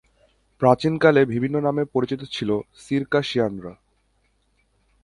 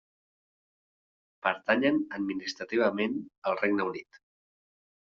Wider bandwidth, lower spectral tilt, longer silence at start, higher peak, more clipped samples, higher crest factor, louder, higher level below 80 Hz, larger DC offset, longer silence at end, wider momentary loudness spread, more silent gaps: first, 11.5 kHz vs 7.4 kHz; first, -7 dB/octave vs -3 dB/octave; second, 0.6 s vs 1.45 s; first, -2 dBFS vs -10 dBFS; neither; about the same, 22 dB vs 22 dB; first, -22 LUFS vs -29 LUFS; first, -56 dBFS vs -74 dBFS; neither; first, 1.3 s vs 1.1 s; about the same, 10 LU vs 8 LU; second, none vs 3.38-3.42 s